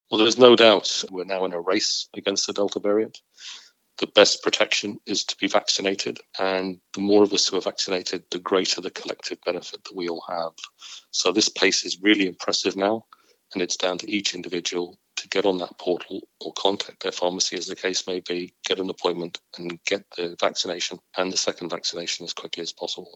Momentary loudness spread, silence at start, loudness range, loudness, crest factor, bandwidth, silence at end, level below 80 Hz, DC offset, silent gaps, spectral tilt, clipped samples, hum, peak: 14 LU; 0.1 s; 5 LU; -23 LUFS; 24 dB; 8.4 kHz; 0.1 s; -80 dBFS; under 0.1%; none; -2.5 dB/octave; under 0.1%; none; 0 dBFS